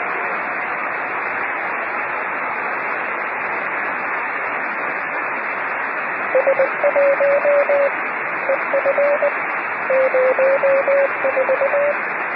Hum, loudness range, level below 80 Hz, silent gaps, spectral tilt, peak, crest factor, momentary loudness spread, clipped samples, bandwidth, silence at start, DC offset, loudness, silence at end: none; 5 LU; -72 dBFS; none; -9 dB/octave; -4 dBFS; 14 dB; 6 LU; under 0.1%; 5.2 kHz; 0 s; under 0.1%; -19 LUFS; 0 s